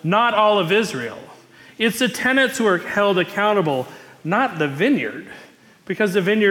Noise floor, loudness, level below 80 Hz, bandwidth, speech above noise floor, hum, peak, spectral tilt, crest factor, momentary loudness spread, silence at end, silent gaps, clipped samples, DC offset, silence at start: -45 dBFS; -19 LUFS; -66 dBFS; 18 kHz; 27 dB; none; -6 dBFS; -4.5 dB/octave; 14 dB; 15 LU; 0 s; none; under 0.1%; under 0.1%; 0.05 s